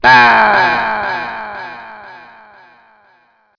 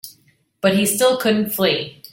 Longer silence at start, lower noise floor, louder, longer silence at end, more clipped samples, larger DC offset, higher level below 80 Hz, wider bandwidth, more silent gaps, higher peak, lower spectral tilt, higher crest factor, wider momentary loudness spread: about the same, 0 s vs 0.05 s; second, -54 dBFS vs -58 dBFS; first, -11 LUFS vs -18 LUFS; first, 1.4 s vs 0.2 s; first, 0.4% vs under 0.1%; neither; first, -48 dBFS vs -60 dBFS; second, 5.4 kHz vs 17 kHz; neither; first, 0 dBFS vs -4 dBFS; about the same, -4 dB/octave vs -3.5 dB/octave; about the same, 14 dB vs 16 dB; first, 25 LU vs 6 LU